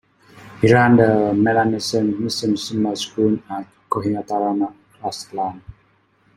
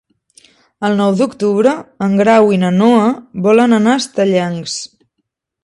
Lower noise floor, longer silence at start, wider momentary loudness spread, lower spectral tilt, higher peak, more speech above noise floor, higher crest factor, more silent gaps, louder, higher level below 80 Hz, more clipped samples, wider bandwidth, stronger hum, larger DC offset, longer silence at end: second, -59 dBFS vs -71 dBFS; second, 0.4 s vs 0.8 s; first, 14 LU vs 11 LU; about the same, -6 dB/octave vs -6 dB/octave; about the same, -2 dBFS vs 0 dBFS; second, 41 dB vs 59 dB; about the same, 18 dB vs 14 dB; neither; second, -19 LUFS vs -13 LUFS; about the same, -54 dBFS vs -58 dBFS; neither; first, 15 kHz vs 11 kHz; neither; neither; second, 0.65 s vs 0.8 s